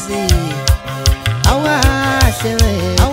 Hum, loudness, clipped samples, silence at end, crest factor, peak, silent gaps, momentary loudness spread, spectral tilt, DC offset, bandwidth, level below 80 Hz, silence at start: none; -14 LUFS; under 0.1%; 0 s; 14 dB; 0 dBFS; none; 4 LU; -4.5 dB/octave; under 0.1%; 16.5 kHz; -18 dBFS; 0 s